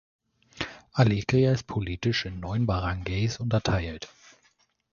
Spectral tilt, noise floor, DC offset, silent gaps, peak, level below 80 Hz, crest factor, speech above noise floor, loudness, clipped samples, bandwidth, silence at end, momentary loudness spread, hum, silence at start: -6.5 dB/octave; -67 dBFS; under 0.1%; none; -6 dBFS; -44 dBFS; 20 dB; 42 dB; -27 LUFS; under 0.1%; 7.2 kHz; 0.85 s; 13 LU; none; 0.55 s